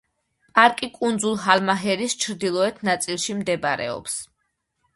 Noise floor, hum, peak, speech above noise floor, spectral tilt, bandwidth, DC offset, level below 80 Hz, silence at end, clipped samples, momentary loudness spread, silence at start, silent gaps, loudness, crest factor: -74 dBFS; none; 0 dBFS; 52 dB; -3 dB/octave; 12 kHz; under 0.1%; -64 dBFS; 0.7 s; under 0.1%; 10 LU; 0.55 s; none; -22 LUFS; 24 dB